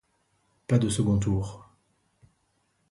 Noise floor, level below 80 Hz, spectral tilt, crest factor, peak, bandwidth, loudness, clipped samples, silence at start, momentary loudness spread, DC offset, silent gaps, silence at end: -72 dBFS; -48 dBFS; -6.5 dB/octave; 20 dB; -10 dBFS; 11.5 kHz; -26 LUFS; under 0.1%; 0.7 s; 14 LU; under 0.1%; none; 1.3 s